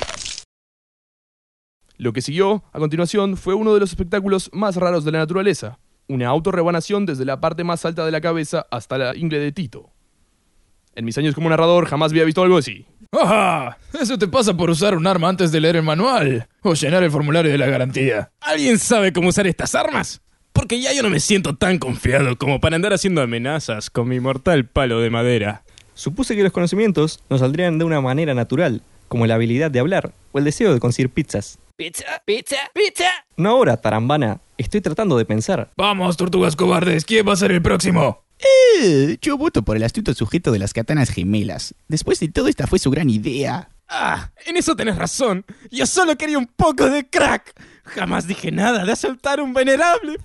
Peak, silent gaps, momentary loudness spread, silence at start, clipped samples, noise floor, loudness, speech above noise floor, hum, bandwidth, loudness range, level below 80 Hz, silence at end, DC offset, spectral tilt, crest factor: -2 dBFS; 0.45-1.80 s; 9 LU; 0 s; under 0.1%; -61 dBFS; -18 LUFS; 43 dB; none; 11.5 kHz; 4 LU; -40 dBFS; 0 s; under 0.1%; -5 dB/octave; 16 dB